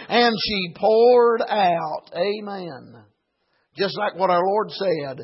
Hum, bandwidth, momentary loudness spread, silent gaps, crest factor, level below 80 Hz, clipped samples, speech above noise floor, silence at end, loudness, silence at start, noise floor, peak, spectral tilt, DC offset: none; 5.8 kHz; 14 LU; none; 16 dB; -60 dBFS; under 0.1%; 49 dB; 0 s; -20 LUFS; 0 s; -70 dBFS; -6 dBFS; -8 dB/octave; under 0.1%